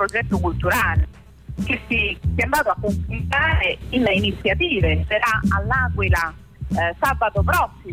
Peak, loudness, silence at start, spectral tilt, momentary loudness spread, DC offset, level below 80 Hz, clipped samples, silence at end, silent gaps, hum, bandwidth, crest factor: -8 dBFS; -20 LUFS; 0 s; -5.5 dB/octave; 6 LU; under 0.1%; -30 dBFS; under 0.1%; 0 s; none; none; 16 kHz; 12 dB